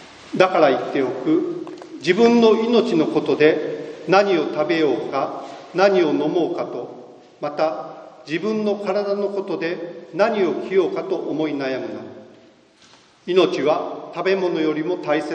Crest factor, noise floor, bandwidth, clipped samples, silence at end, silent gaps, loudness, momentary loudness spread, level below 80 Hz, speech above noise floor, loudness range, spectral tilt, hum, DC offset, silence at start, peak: 20 dB; -51 dBFS; 8.8 kHz; under 0.1%; 0 s; none; -20 LUFS; 15 LU; -68 dBFS; 32 dB; 6 LU; -6 dB/octave; none; under 0.1%; 0 s; 0 dBFS